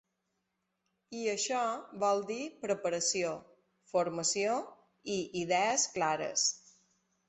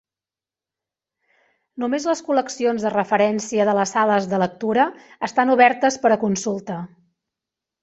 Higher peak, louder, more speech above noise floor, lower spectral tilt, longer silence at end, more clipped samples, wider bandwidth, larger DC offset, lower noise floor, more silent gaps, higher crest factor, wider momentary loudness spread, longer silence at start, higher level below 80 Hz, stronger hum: second, -18 dBFS vs -2 dBFS; second, -33 LUFS vs -20 LUFS; second, 50 dB vs over 70 dB; second, -2 dB/octave vs -4.5 dB/octave; second, 0.7 s vs 0.95 s; neither; about the same, 8.4 kHz vs 8.2 kHz; neither; second, -83 dBFS vs under -90 dBFS; neither; about the same, 18 dB vs 20 dB; second, 9 LU vs 13 LU; second, 1.1 s vs 1.75 s; second, -76 dBFS vs -66 dBFS; neither